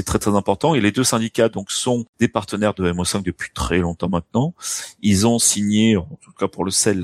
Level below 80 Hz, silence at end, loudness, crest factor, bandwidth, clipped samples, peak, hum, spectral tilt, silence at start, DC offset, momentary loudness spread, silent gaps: -40 dBFS; 0 s; -19 LUFS; 18 dB; 16 kHz; under 0.1%; -2 dBFS; none; -4 dB/octave; 0 s; under 0.1%; 9 LU; 2.09-2.13 s